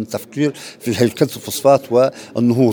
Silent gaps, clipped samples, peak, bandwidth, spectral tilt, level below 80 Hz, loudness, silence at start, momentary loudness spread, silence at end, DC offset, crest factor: none; under 0.1%; 0 dBFS; over 20 kHz; -6 dB/octave; -60 dBFS; -17 LUFS; 0 s; 9 LU; 0 s; under 0.1%; 16 dB